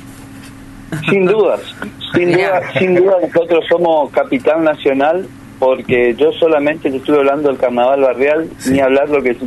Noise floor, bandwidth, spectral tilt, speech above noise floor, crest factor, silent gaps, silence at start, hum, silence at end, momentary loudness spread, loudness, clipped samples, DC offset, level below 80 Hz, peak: -33 dBFS; 12.5 kHz; -6 dB/octave; 21 dB; 12 dB; none; 0 s; none; 0 s; 9 LU; -13 LUFS; under 0.1%; under 0.1%; -48 dBFS; -2 dBFS